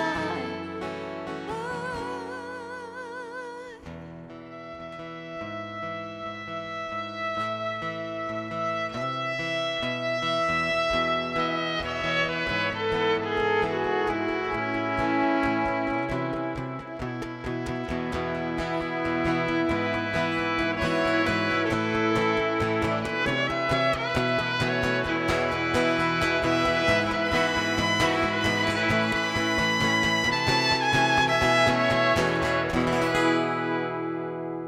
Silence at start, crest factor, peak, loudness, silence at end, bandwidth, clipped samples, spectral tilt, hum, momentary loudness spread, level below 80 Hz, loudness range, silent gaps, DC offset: 0 s; 16 dB; -10 dBFS; -26 LUFS; 0 s; 15.5 kHz; under 0.1%; -4.5 dB/octave; none; 13 LU; -48 dBFS; 13 LU; none; under 0.1%